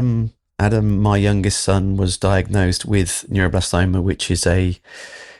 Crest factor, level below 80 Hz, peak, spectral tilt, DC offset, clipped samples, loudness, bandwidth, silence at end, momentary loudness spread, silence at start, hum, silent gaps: 14 dB; -34 dBFS; -4 dBFS; -5.5 dB/octave; 0.4%; under 0.1%; -18 LUFS; 12.5 kHz; 0.05 s; 6 LU; 0 s; none; none